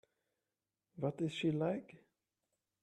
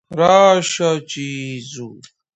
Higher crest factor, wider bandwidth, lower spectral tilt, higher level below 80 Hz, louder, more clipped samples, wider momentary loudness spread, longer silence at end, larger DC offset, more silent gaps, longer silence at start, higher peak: about the same, 18 dB vs 18 dB; first, 10.5 kHz vs 8.8 kHz; first, -7 dB/octave vs -4 dB/octave; second, -80 dBFS vs -60 dBFS; second, -39 LUFS vs -15 LUFS; neither; second, 6 LU vs 21 LU; first, 0.85 s vs 0.4 s; neither; neither; first, 0.95 s vs 0.1 s; second, -24 dBFS vs 0 dBFS